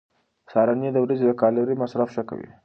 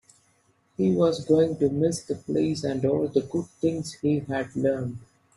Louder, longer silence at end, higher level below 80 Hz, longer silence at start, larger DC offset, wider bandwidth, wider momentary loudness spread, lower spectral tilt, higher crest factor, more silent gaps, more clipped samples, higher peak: first, -22 LUFS vs -26 LUFS; second, 0.2 s vs 0.35 s; second, -68 dBFS vs -60 dBFS; second, 0.5 s vs 0.8 s; neither; second, 6.4 kHz vs 12 kHz; about the same, 7 LU vs 9 LU; first, -9.5 dB/octave vs -7 dB/octave; about the same, 18 dB vs 16 dB; neither; neither; about the same, -6 dBFS vs -8 dBFS